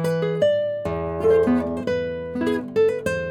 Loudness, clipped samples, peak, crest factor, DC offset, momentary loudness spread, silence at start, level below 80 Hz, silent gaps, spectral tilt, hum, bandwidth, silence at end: -22 LUFS; under 0.1%; -8 dBFS; 14 dB; under 0.1%; 7 LU; 0 s; -46 dBFS; none; -7 dB/octave; none; 13.5 kHz; 0 s